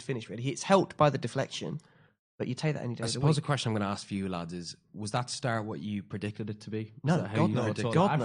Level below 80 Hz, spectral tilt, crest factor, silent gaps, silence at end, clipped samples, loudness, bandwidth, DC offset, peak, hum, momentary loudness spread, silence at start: -66 dBFS; -6 dB/octave; 22 dB; 2.19-2.38 s; 0 s; under 0.1%; -31 LUFS; 11 kHz; under 0.1%; -10 dBFS; none; 12 LU; 0 s